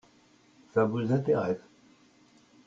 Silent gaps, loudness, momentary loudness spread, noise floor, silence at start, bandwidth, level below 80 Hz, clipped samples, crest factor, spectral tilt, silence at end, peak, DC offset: none; -29 LUFS; 7 LU; -62 dBFS; 0.75 s; 7.6 kHz; -66 dBFS; under 0.1%; 18 dB; -8.5 dB/octave; 1.1 s; -14 dBFS; under 0.1%